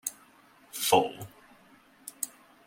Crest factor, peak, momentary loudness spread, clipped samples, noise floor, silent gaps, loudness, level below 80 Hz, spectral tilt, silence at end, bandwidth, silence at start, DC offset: 26 dB; -8 dBFS; 22 LU; under 0.1%; -59 dBFS; none; -29 LUFS; -72 dBFS; -2.5 dB/octave; 0.4 s; 16.5 kHz; 0.05 s; under 0.1%